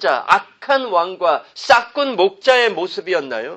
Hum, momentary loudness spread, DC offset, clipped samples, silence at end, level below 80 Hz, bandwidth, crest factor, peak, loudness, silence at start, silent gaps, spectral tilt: none; 7 LU; under 0.1%; under 0.1%; 0 s; -62 dBFS; 10 kHz; 18 dB; 0 dBFS; -17 LUFS; 0 s; none; -3 dB/octave